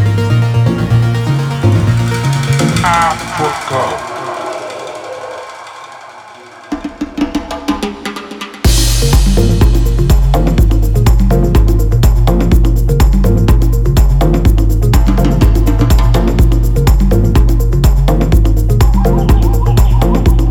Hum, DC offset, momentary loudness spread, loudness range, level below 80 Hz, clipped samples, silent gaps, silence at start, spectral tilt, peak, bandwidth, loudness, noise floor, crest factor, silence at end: none; under 0.1%; 12 LU; 10 LU; -12 dBFS; under 0.1%; none; 0 s; -6 dB/octave; 0 dBFS; 16.5 kHz; -12 LUFS; -34 dBFS; 10 dB; 0 s